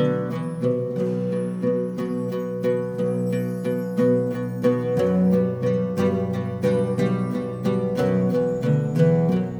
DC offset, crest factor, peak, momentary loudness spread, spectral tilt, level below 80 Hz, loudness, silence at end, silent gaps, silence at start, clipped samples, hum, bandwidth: under 0.1%; 16 dB; -6 dBFS; 6 LU; -9 dB/octave; -58 dBFS; -23 LUFS; 0 s; none; 0 s; under 0.1%; none; 20 kHz